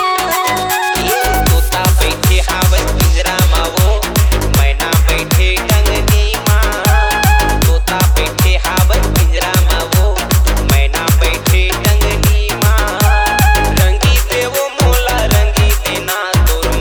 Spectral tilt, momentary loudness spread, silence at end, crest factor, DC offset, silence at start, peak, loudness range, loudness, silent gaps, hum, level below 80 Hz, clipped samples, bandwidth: -4 dB/octave; 2 LU; 0 s; 10 dB; under 0.1%; 0 s; 0 dBFS; 1 LU; -12 LUFS; none; none; -14 dBFS; under 0.1%; over 20 kHz